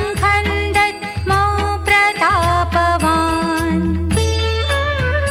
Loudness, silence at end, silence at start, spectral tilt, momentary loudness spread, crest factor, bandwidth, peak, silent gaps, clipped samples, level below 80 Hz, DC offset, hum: -16 LUFS; 0 s; 0 s; -5 dB/octave; 5 LU; 12 dB; 16 kHz; -2 dBFS; none; under 0.1%; -26 dBFS; under 0.1%; none